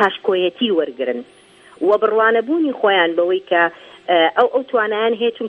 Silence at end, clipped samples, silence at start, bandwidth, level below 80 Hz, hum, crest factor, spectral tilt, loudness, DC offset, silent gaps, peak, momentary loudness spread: 0 s; under 0.1%; 0 s; 5.8 kHz; -70 dBFS; none; 18 dB; -5.5 dB/octave; -17 LUFS; under 0.1%; none; 0 dBFS; 8 LU